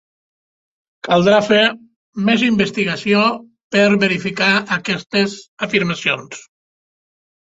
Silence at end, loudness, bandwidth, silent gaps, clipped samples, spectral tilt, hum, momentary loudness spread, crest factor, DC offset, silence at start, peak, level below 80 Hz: 1 s; -16 LUFS; 8 kHz; 1.96-2.13 s, 3.64-3.70 s, 5.06-5.10 s, 5.48-5.57 s; under 0.1%; -5 dB/octave; none; 15 LU; 16 dB; under 0.1%; 1.05 s; -2 dBFS; -56 dBFS